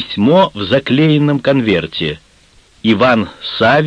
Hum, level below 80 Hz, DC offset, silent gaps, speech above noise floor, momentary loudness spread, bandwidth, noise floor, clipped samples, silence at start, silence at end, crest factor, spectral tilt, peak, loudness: none; -46 dBFS; under 0.1%; none; 36 dB; 9 LU; 9.6 kHz; -48 dBFS; under 0.1%; 0 s; 0 s; 14 dB; -7.5 dB/octave; 0 dBFS; -13 LUFS